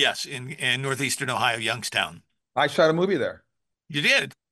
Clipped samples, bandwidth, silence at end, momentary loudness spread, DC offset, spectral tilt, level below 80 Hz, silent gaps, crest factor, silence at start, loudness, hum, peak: under 0.1%; 12.5 kHz; 0.2 s; 11 LU; under 0.1%; -3 dB/octave; -70 dBFS; none; 20 dB; 0 s; -24 LUFS; none; -6 dBFS